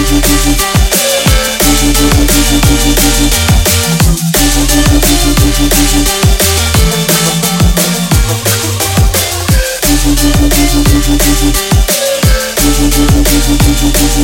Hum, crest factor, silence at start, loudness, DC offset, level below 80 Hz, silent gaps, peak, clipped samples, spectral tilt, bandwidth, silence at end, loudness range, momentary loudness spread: none; 8 dB; 0 s; -9 LUFS; under 0.1%; -12 dBFS; none; 0 dBFS; 0.4%; -3.5 dB/octave; 19.5 kHz; 0 s; 2 LU; 2 LU